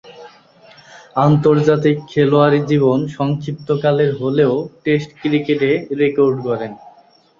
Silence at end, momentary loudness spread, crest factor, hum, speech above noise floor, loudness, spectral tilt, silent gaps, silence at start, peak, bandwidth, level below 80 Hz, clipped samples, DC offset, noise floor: 0.5 s; 8 LU; 14 dB; none; 34 dB; -16 LUFS; -8 dB/octave; none; 0.05 s; -2 dBFS; 7.2 kHz; -56 dBFS; under 0.1%; under 0.1%; -49 dBFS